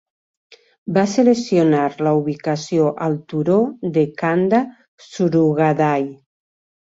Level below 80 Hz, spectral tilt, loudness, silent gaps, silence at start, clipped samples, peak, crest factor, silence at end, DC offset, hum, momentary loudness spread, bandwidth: -62 dBFS; -7 dB/octave; -18 LUFS; 4.88-4.98 s; 0.85 s; under 0.1%; -2 dBFS; 16 dB; 0.7 s; under 0.1%; none; 8 LU; 8 kHz